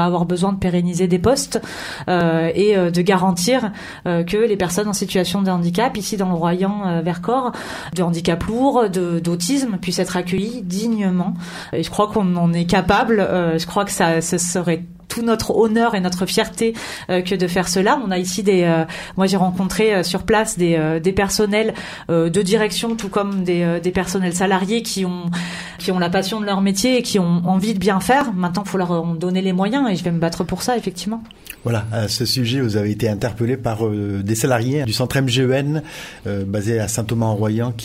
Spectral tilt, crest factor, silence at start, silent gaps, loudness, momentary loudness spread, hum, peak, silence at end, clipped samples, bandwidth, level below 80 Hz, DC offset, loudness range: -5 dB/octave; 16 dB; 0 s; none; -19 LUFS; 7 LU; none; -2 dBFS; 0 s; under 0.1%; 16 kHz; -44 dBFS; under 0.1%; 3 LU